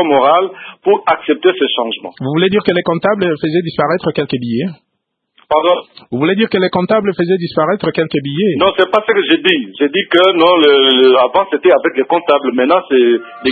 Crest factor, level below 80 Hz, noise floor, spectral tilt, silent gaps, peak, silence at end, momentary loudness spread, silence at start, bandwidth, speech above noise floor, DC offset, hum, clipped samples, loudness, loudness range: 12 dB; -54 dBFS; -71 dBFS; -7.5 dB/octave; none; 0 dBFS; 0 s; 9 LU; 0 s; 4.8 kHz; 58 dB; under 0.1%; none; under 0.1%; -12 LUFS; 6 LU